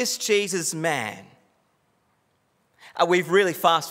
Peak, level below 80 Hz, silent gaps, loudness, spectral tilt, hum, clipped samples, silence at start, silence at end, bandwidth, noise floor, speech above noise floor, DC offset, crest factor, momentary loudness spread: -4 dBFS; -82 dBFS; none; -22 LUFS; -3 dB/octave; none; under 0.1%; 0 s; 0 s; 16 kHz; -68 dBFS; 46 dB; under 0.1%; 20 dB; 14 LU